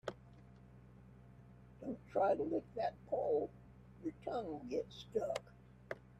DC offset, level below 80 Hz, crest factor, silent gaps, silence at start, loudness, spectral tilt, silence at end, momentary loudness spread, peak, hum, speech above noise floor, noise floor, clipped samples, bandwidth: under 0.1%; -66 dBFS; 18 dB; none; 0.05 s; -41 LUFS; -6.5 dB/octave; 0.2 s; 24 LU; -24 dBFS; none; 20 dB; -60 dBFS; under 0.1%; 13 kHz